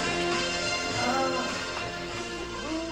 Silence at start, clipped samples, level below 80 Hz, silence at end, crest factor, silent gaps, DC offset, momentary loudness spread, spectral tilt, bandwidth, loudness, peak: 0 s; under 0.1%; -50 dBFS; 0 s; 16 dB; none; under 0.1%; 8 LU; -3 dB/octave; 16 kHz; -29 LUFS; -14 dBFS